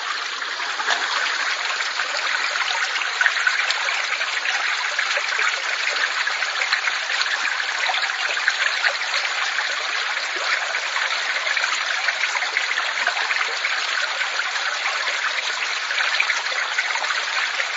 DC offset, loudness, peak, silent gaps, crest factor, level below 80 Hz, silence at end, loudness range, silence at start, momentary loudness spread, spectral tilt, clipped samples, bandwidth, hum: under 0.1%; -21 LUFS; 0 dBFS; none; 22 dB; under -90 dBFS; 0 s; 1 LU; 0 s; 3 LU; 4.5 dB/octave; under 0.1%; 8 kHz; none